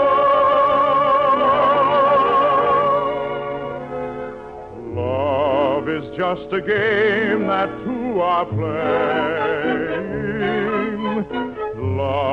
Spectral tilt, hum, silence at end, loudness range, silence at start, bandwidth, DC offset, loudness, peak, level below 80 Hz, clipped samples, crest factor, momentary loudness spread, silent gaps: -8 dB/octave; none; 0 s; 6 LU; 0 s; 6.2 kHz; under 0.1%; -19 LUFS; -8 dBFS; -50 dBFS; under 0.1%; 12 dB; 12 LU; none